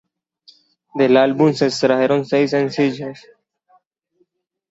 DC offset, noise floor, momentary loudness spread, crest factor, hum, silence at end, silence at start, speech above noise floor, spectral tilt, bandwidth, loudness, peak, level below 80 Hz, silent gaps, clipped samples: under 0.1%; -65 dBFS; 12 LU; 18 dB; none; 1.5 s; 0.95 s; 49 dB; -6 dB/octave; 8 kHz; -16 LUFS; -2 dBFS; -64 dBFS; none; under 0.1%